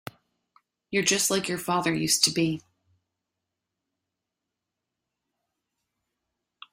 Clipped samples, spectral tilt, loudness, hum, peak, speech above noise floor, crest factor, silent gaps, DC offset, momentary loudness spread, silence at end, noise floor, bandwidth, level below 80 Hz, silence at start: under 0.1%; -2.5 dB/octave; -24 LUFS; none; -4 dBFS; 60 dB; 28 dB; none; under 0.1%; 8 LU; 4.15 s; -86 dBFS; 16 kHz; -66 dBFS; 0.9 s